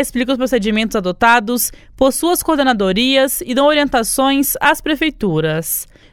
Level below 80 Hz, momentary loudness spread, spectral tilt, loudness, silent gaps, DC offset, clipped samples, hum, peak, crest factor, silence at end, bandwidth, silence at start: -40 dBFS; 5 LU; -3.5 dB/octave; -15 LUFS; none; under 0.1%; under 0.1%; none; 0 dBFS; 16 dB; 0.3 s; 18 kHz; 0 s